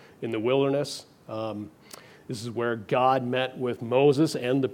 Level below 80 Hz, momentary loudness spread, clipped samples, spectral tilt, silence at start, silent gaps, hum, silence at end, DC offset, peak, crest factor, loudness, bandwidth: -72 dBFS; 17 LU; under 0.1%; -6 dB/octave; 0.2 s; none; none; 0 s; under 0.1%; -10 dBFS; 18 dB; -26 LUFS; 16 kHz